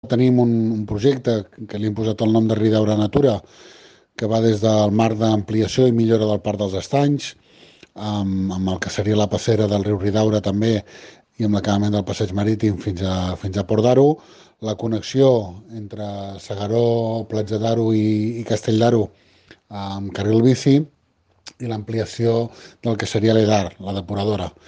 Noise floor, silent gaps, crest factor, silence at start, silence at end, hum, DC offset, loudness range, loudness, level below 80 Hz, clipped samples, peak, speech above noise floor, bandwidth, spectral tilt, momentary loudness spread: -62 dBFS; none; 16 dB; 0.05 s; 0.2 s; none; under 0.1%; 3 LU; -20 LUFS; -50 dBFS; under 0.1%; -4 dBFS; 43 dB; 9 kHz; -7 dB/octave; 12 LU